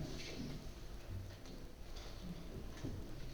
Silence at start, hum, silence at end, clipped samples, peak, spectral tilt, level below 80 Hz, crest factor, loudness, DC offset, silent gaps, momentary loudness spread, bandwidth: 0 s; none; 0 s; under 0.1%; -34 dBFS; -5.5 dB/octave; -52 dBFS; 14 dB; -50 LUFS; under 0.1%; none; 7 LU; over 20 kHz